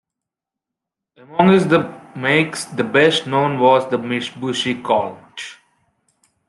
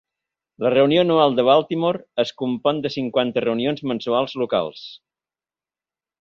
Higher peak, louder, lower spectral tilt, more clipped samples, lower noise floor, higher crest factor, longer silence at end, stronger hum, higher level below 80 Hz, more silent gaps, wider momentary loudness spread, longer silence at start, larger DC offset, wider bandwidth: about the same, -2 dBFS vs -4 dBFS; first, -17 LUFS vs -20 LUFS; second, -5 dB/octave vs -7 dB/octave; neither; second, -85 dBFS vs under -90 dBFS; about the same, 18 dB vs 18 dB; second, 0.95 s vs 1.25 s; neither; about the same, -62 dBFS vs -64 dBFS; neither; first, 15 LU vs 9 LU; first, 1.3 s vs 0.6 s; neither; first, 12 kHz vs 7 kHz